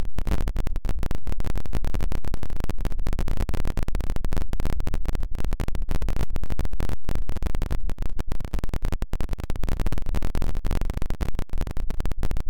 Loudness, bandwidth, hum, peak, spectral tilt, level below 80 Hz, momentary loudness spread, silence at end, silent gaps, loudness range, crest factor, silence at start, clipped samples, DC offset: -32 LUFS; 16.5 kHz; none; -14 dBFS; -6.5 dB/octave; -26 dBFS; 3 LU; 0 s; none; 1 LU; 4 dB; 0 s; under 0.1%; 7%